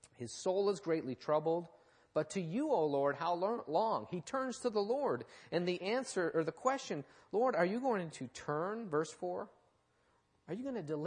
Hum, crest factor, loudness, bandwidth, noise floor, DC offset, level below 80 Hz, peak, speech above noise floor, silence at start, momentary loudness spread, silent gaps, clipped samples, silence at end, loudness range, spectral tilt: none; 18 dB; -37 LUFS; 10 kHz; -75 dBFS; under 0.1%; -80 dBFS; -18 dBFS; 38 dB; 0.05 s; 9 LU; none; under 0.1%; 0 s; 2 LU; -5.5 dB/octave